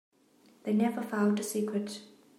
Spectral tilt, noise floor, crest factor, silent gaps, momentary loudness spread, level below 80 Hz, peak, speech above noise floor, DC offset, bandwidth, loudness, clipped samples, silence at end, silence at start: -5.5 dB/octave; -63 dBFS; 16 dB; none; 12 LU; -86 dBFS; -16 dBFS; 33 dB; under 0.1%; 15.5 kHz; -31 LUFS; under 0.1%; 0.3 s; 0.65 s